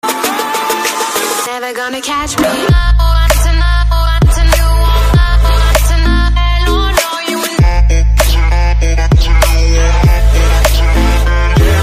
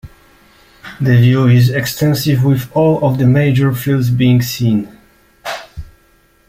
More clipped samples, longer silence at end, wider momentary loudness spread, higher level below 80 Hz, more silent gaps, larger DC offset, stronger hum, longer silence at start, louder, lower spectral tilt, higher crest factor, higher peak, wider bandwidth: neither; second, 0 s vs 0.6 s; second, 4 LU vs 16 LU; first, -10 dBFS vs -42 dBFS; neither; neither; neither; about the same, 0.05 s vs 0.05 s; about the same, -11 LUFS vs -13 LUFS; second, -4.5 dB/octave vs -7 dB/octave; about the same, 8 dB vs 12 dB; about the same, 0 dBFS vs -2 dBFS; about the same, 15.5 kHz vs 16 kHz